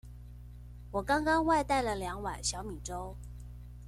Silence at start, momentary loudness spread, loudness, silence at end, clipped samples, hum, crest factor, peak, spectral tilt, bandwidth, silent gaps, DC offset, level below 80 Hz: 0.05 s; 23 LU; -32 LUFS; 0 s; under 0.1%; 60 Hz at -45 dBFS; 18 dB; -16 dBFS; -4 dB/octave; 15.5 kHz; none; under 0.1%; -46 dBFS